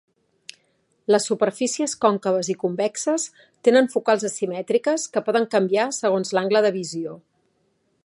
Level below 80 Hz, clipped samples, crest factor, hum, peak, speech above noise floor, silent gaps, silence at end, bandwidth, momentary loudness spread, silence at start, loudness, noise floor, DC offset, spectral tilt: -76 dBFS; under 0.1%; 20 dB; none; -4 dBFS; 47 dB; none; 0.85 s; 11.5 kHz; 9 LU; 1.1 s; -22 LUFS; -68 dBFS; under 0.1%; -4 dB/octave